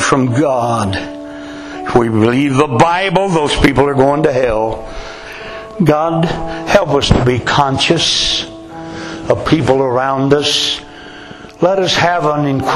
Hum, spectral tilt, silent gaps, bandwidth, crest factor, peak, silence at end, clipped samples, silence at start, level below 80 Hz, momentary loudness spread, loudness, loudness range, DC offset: none; -5 dB/octave; none; 13 kHz; 14 dB; 0 dBFS; 0 s; under 0.1%; 0 s; -32 dBFS; 17 LU; -13 LUFS; 2 LU; under 0.1%